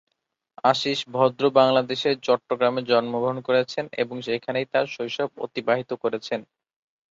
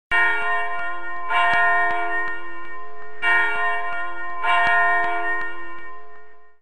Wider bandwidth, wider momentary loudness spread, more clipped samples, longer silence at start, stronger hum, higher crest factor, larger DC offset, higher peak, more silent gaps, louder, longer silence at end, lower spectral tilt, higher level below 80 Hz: second, 7.8 kHz vs 14.5 kHz; second, 9 LU vs 19 LU; neither; first, 0.65 s vs 0.1 s; neither; first, 22 dB vs 16 dB; second, under 0.1% vs 6%; about the same, -4 dBFS vs -6 dBFS; neither; second, -24 LUFS vs -21 LUFS; first, 0.7 s vs 0 s; first, -5 dB/octave vs -3.5 dB/octave; second, -70 dBFS vs -54 dBFS